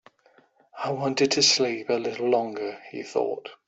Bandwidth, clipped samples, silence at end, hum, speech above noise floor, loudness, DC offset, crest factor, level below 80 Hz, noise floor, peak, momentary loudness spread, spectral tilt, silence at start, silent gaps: 8.2 kHz; under 0.1%; 0.1 s; none; 35 dB; -25 LUFS; under 0.1%; 20 dB; -70 dBFS; -61 dBFS; -8 dBFS; 15 LU; -2.5 dB/octave; 0.75 s; none